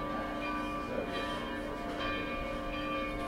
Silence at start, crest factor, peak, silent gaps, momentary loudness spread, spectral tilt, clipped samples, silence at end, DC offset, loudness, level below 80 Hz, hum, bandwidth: 0 s; 14 dB; -22 dBFS; none; 2 LU; -5.5 dB/octave; under 0.1%; 0 s; under 0.1%; -36 LUFS; -48 dBFS; none; 16 kHz